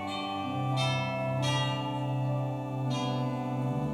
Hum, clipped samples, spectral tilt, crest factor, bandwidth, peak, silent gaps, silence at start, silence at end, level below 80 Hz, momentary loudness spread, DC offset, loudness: none; under 0.1%; -6 dB/octave; 14 dB; 11 kHz; -18 dBFS; none; 0 s; 0 s; -62 dBFS; 5 LU; under 0.1%; -31 LUFS